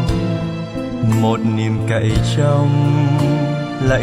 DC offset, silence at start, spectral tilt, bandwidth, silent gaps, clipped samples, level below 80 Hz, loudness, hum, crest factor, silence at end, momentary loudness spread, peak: under 0.1%; 0 s; -7 dB/octave; 13 kHz; none; under 0.1%; -32 dBFS; -17 LUFS; none; 12 dB; 0 s; 6 LU; -4 dBFS